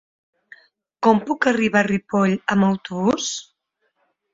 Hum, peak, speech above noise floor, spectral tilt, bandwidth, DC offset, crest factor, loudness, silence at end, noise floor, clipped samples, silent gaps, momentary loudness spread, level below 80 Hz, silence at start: none; -2 dBFS; 52 dB; -5 dB/octave; 7.8 kHz; under 0.1%; 18 dB; -20 LUFS; 0.9 s; -71 dBFS; under 0.1%; none; 5 LU; -58 dBFS; 1 s